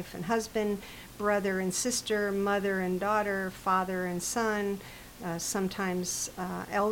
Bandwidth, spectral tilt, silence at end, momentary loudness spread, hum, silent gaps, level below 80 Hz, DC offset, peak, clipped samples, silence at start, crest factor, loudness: 17 kHz; -4 dB/octave; 0 s; 7 LU; none; none; -56 dBFS; under 0.1%; -14 dBFS; under 0.1%; 0 s; 16 dB; -31 LUFS